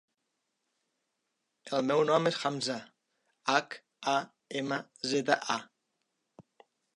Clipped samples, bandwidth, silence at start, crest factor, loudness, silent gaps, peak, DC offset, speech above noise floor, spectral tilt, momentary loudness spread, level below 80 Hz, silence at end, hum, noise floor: under 0.1%; 11.5 kHz; 1.65 s; 24 dB; -31 LUFS; none; -10 dBFS; under 0.1%; 52 dB; -4 dB/octave; 10 LU; -86 dBFS; 0.55 s; none; -83 dBFS